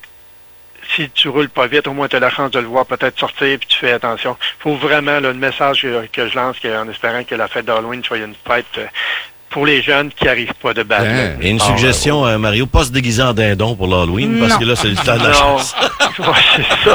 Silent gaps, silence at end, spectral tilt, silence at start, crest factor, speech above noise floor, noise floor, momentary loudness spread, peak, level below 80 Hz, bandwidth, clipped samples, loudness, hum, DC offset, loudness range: none; 0 s; -4 dB/octave; 0.8 s; 14 dB; 26 dB; -40 dBFS; 9 LU; 0 dBFS; -32 dBFS; over 20 kHz; under 0.1%; -14 LUFS; none; under 0.1%; 5 LU